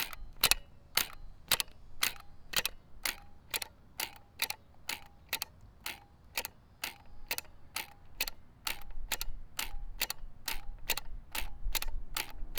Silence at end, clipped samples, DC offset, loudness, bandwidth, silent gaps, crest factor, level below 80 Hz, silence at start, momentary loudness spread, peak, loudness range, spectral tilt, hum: 0 s; under 0.1%; under 0.1%; -37 LUFS; over 20 kHz; none; 34 dB; -46 dBFS; 0 s; 12 LU; -4 dBFS; 7 LU; 0 dB/octave; none